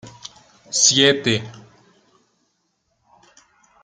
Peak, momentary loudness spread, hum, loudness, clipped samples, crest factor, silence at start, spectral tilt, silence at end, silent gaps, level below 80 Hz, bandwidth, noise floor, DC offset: 0 dBFS; 27 LU; none; -16 LUFS; under 0.1%; 22 dB; 0.05 s; -2 dB/octave; 2.25 s; none; -62 dBFS; 10.5 kHz; -70 dBFS; under 0.1%